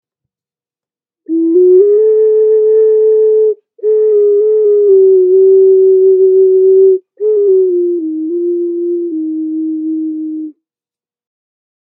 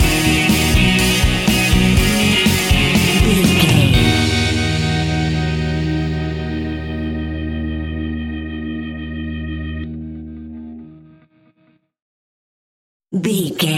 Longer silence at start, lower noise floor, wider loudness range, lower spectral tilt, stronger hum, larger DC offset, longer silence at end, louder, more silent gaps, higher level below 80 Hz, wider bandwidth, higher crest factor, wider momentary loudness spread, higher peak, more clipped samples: first, 1.3 s vs 0 s; first, under -90 dBFS vs -58 dBFS; second, 10 LU vs 17 LU; first, -12 dB/octave vs -4.5 dB/octave; neither; neither; first, 1.4 s vs 0 s; first, -10 LUFS vs -16 LUFS; second, none vs 12.02-13.00 s; second, -82 dBFS vs -26 dBFS; second, 1.8 kHz vs 17 kHz; second, 10 dB vs 16 dB; second, 11 LU vs 14 LU; about the same, 0 dBFS vs 0 dBFS; neither